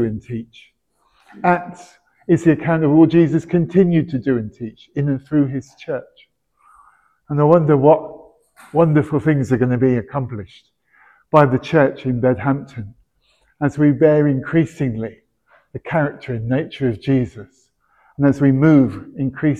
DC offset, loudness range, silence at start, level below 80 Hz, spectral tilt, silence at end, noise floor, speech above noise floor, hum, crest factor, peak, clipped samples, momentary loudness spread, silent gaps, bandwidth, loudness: under 0.1%; 5 LU; 0 s; -50 dBFS; -9 dB/octave; 0 s; -62 dBFS; 45 dB; none; 18 dB; 0 dBFS; under 0.1%; 16 LU; none; 8.8 kHz; -17 LUFS